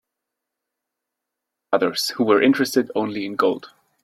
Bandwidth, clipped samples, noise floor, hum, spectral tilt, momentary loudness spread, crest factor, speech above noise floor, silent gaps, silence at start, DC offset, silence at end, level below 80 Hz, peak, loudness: 16 kHz; under 0.1%; -83 dBFS; none; -4 dB/octave; 8 LU; 18 dB; 63 dB; none; 1.7 s; under 0.1%; 0.35 s; -68 dBFS; -4 dBFS; -20 LUFS